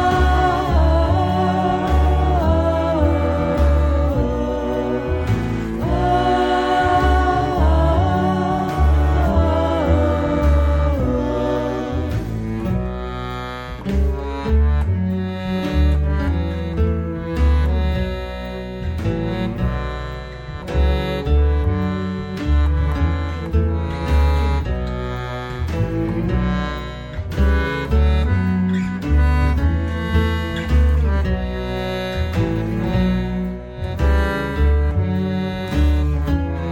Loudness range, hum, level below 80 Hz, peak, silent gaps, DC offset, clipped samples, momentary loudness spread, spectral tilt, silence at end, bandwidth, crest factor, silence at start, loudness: 5 LU; none; -22 dBFS; -4 dBFS; none; under 0.1%; under 0.1%; 8 LU; -8 dB/octave; 0 s; 7.8 kHz; 12 dB; 0 s; -20 LUFS